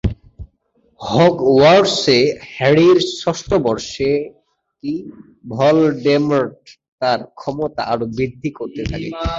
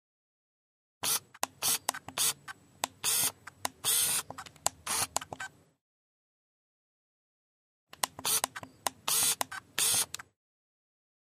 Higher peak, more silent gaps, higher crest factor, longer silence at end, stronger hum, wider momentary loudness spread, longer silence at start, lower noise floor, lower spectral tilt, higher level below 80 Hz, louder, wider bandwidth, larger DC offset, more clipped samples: first, -2 dBFS vs -6 dBFS; second, 6.88-6.98 s vs 5.81-7.87 s; second, 16 dB vs 30 dB; second, 0 s vs 1.35 s; neither; about the same, 15 LU vs 13 LU; second, 0.05 s vs 1.05 s; first, -60 dBFS vs -51 dBFS; first, -5.5 dB/octave vs 0.5 dB/octave; first, -38 dBFS vs -72 dBFS; first, -16 LUFS vs -30 LUFS; second, 8 kHz vs 15.5 kHz; neither; neither